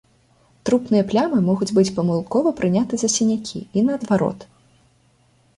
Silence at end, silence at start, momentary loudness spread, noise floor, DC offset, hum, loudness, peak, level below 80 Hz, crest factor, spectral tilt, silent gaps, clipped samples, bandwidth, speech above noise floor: 1.15 s; 0.65 s; 7 LU; -59 dBFS; under 0.1%; none; -20 LUFS; -6 dBFS; -56 dBFS; 16 dB; -5.5 dB/octave; none; under 0.1%; 11.5 kHz; 39 dB